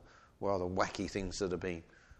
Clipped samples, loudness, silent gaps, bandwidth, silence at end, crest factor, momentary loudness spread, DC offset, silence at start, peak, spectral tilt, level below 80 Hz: under 0.1%; -37 LUFS; none; 11.5 kHz; 0.05 s; 24 dB; 6 LU; under 0.1%; 0 s; -14 dBFS; -5 dB/octave; -56 dBFS